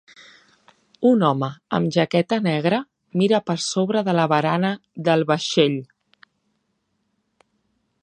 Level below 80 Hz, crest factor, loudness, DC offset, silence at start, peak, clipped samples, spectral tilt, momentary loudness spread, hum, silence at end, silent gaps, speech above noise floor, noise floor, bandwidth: -68 dBFS; 20 dB; -21 LUFS; under 0.1%; 1 s; -4 dBFS; under 0.1%; -5.5 dB/octave; 7 LU; none; 2.2 s; none; 52 dB; -72 dBFS; 9.6 kHz